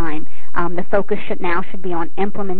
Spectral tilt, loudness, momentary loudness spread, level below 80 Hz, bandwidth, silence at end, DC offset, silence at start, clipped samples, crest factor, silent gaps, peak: -5.5 dB/octave; -23 LUFS; 7 LU; -44 dBFS; 5.2 kHz; 0 s; 40%; 0 s; under 0.1%; 18 dB; none; 0 dBFS